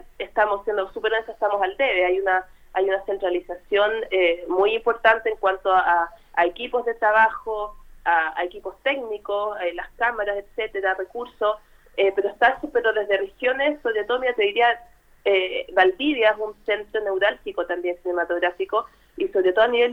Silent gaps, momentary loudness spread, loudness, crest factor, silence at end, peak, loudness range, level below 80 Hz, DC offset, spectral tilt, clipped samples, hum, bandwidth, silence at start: none; 10 LU; -22 LUFS; 20 dB; 0 s; -2 dBFS; 4 LU; -52 dBFS; under 0.1%; -4.5 dB/octave; under 0.1%; none; 5.8 kHz; 0.2 s